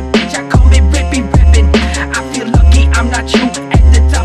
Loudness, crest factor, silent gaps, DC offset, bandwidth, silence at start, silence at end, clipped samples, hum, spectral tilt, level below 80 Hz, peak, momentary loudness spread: -10 LUFS; 8 dB; none; under 0.1%; 10.5 kHz; 0 s; 0 s; under 0.1%; none; -5.5 dB/octave; -10 dBFS; 0 dBFS; 6 LU